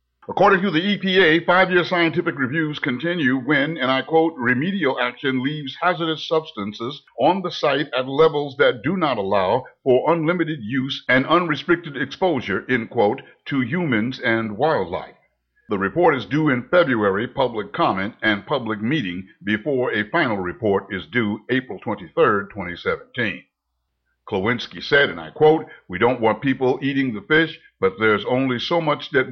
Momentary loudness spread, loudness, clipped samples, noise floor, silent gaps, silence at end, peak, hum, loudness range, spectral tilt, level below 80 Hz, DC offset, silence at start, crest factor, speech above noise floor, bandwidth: 8 LU; -20 LUFS; under 0.1%; -75 dBFS; none; 0 s; -6 dBFS; none; 4 LU; -7 dB/octave; -58 dBFS; under 0.1%; 0.3 s; 16 dB; 55 dB; 6.6 kHz